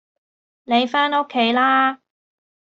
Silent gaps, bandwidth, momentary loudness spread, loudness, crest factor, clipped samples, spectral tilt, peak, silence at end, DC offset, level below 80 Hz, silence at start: none; 7.6 kHz; 6 LU; -18 LUFS; 16 dB; under 0.1%; -4.5 dB/octave; -6 dBFS; 0.8 s; under 0.1%; -72 dBFS; 0.7 s